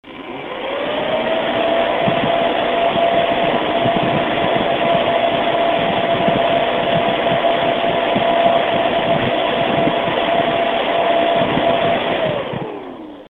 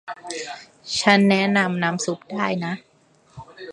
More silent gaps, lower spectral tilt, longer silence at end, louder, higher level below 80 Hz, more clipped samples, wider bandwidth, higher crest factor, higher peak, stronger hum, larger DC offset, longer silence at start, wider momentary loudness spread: neither; first, -7 dB/octave vs -4.5 dB/octave; about the same, 0.1 s vs 0 s; first, -16 LUFS vs -21 LUFS; first, -46 dBFS vs -62 dBFS; neither; second, 4.3 kHz vs 11 kHz; second, 16 dB vs 22 dB; about the same, 0 dBFS vs 0 dBFS; neither; neither; about the same, 0.05 s vs 0.05 s; second, 6 LU vs 19 LU